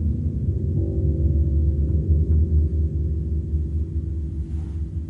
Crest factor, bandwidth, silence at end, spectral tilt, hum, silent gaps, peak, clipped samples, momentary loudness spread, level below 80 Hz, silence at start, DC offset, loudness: 14 dB; 1 kHz; 0 s; -12 dB/octave; none; none; -8 dBFS; under 0.1%; 9 LU; -26 dBFS; 0 s; under 0.1%; -23 LUFS